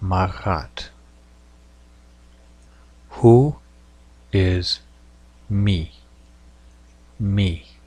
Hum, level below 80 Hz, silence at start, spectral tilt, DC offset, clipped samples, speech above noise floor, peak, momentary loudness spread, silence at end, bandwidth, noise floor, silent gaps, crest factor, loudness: none; -40 dBFS; 0 s; -7.5 dB/octave; under 0.1%; under 0.1%; 31 dB; -2 dBFS; 22 LU; 0.25 s; 9.8 kHz; -49 dBFS; none; 20 dB; -20 LUFS